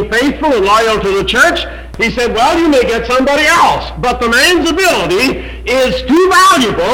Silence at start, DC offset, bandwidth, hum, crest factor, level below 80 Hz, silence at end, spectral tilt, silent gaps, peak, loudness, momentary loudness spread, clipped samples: 0 s; under 0.1%; 19 kHz; none; 10 dB; -30 dBFS; 0 s; -3.5 dB/octave; none; 0 dBFS; -10 LUFS; 7 LU; under 0.1%